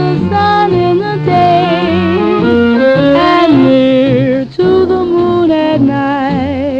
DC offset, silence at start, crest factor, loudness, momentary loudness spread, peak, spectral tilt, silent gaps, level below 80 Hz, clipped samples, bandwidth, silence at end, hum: under 0.1%; 0 s; 10 dB; -10 LUFS; 5 LU; 0 dBFS; -8 dB/octave; none; -40 dBFS; under 0.1%; 7.4 kHz; 0 s; none